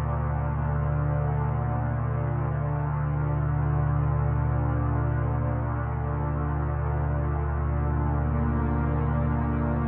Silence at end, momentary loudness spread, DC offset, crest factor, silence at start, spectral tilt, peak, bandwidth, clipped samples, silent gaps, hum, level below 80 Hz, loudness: 0 s; 3 LU; under 0.1%; 12 dB; 0 s; -13 dB/octave; -14 dBFS; 3.1 kHz; under 0.1%; none; none; -32 dBFS; -27 LUFS